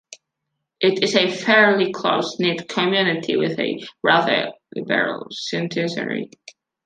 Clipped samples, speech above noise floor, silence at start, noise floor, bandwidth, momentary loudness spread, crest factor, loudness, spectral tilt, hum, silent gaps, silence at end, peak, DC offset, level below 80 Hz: under 0.1%; 59 dB; 0.1 s; -79 dBFS; 9.4 kHz; 11 LU; 20 dB; -20 LUFS; -4.5 dB/octave; none; none; 0.6 s; -2 dBFS; under 0.1%; -68 dBFS